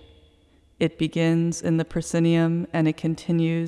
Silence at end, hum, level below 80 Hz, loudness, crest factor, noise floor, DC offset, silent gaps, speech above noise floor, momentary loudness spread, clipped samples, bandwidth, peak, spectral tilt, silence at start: 0 s; none; -52 dBFS; -23 LUFS; 14 dB; -58 dBFS; under 0.1%; none; 36 dB; 6 LU; under 0.1%; 12 kHz; -8 dBFS; -6.5 dB/octave; 0.8 s